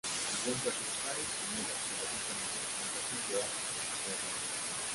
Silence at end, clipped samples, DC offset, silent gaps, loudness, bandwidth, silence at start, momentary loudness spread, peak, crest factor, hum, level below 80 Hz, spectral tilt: 0 s; under 0.1%; under 0.1%; none; -35 LUFS; 12 kHz; 0.05 s; 2 LU; -20 dBFS; 16 dB; none; -68 dBFS; -1 dB/octave